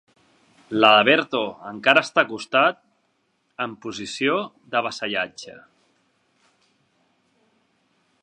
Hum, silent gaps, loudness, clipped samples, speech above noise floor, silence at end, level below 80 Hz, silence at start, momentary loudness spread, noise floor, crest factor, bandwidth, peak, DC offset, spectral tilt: none; none; -21 LUFS; under 0.1%; 48 dB; 2.65 s; -72 dBFS; 0.7 s; 17 LU; -69 dBFS; 24 dB; 10.5 kHz; 0 dBFS; under 0.1%; -3.5 dB/octave